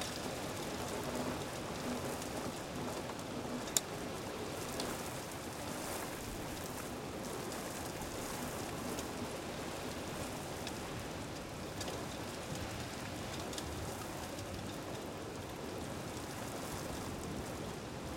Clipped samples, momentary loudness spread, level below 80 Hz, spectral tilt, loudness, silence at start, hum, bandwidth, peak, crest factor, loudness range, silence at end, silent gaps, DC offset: under 0.1%; 4 LU; -58 dBFS; -3.5 dB/octave; -42 LUFS; 0 s; none; 17 kHz; -10 dBFS; 32 dB; 3 LU; 0 s; none; under 0.1%